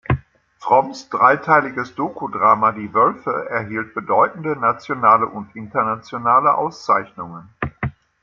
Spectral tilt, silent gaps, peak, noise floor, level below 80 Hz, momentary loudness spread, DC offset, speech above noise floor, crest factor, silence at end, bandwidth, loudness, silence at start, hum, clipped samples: -7 dB/octave; none; 0 dBFS; -41 dBFS; -46 dBFS; 14 LU; under 0.1%; 23 dB; 18 dB; 0.3 s; 7.4 kHz; -18 LUFS; 0.1 s; none; under 0.1%